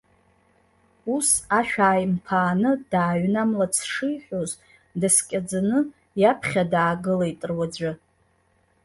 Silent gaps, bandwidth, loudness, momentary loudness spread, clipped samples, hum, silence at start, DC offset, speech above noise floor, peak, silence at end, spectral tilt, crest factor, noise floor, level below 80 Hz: none; 12 kHz; -23 LUFS; 10 LU; under 0.1%; none; 1.05 s; under 0.1%; 42 dB; -4 dBFS; 0.9 s; -4.5 dB/octave; 20 dB; -65 dBFS; -58 dBFS